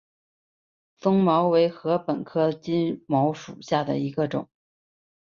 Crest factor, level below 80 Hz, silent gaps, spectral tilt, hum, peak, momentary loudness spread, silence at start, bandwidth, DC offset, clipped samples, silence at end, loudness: 18 dB; -66 dBFS; none; -7.5 dB/octave; none; -8 dBFS; 8 LU; 1.05 s; 7.2 kHz; under 0.1%; under 0.1%; 0.85 s; -24 LUFS